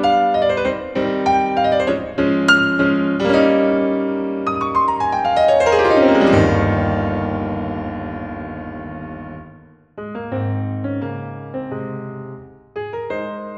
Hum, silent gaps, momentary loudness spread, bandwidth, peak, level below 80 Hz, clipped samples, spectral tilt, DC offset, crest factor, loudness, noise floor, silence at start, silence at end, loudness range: none; none; 17 LU; 9.6 kHz; 0 dBFS; -42 dBFS; under 0.1%; -6.5 dB/octave; under 0.1%; 18 dB; -18 LUFS; -45 dBFS; 0 s; 0 s; 12 LU